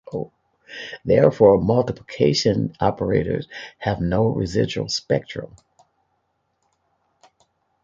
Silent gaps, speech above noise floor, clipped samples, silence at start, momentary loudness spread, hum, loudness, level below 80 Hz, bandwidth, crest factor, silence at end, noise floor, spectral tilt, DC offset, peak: none; 51 dB; under 0.1%; 0.1 s; 19 LU; none; -20 LUFS; -46 dBFS; 7.8 kHz; 20 dB; 2.35 s; -71 dBFS; -6 dB/octave; under 0.1%; -2 dBFS